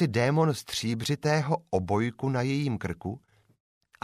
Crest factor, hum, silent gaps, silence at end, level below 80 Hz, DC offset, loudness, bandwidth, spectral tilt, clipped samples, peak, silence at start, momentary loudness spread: 18 dB; none; none; 0.85 s; -58 dBFS; under 0.1%; -28 LUFS; 15 kHz; -6 dB/octave; under 0.1%; -12 dBFS; 0 s; 10 LU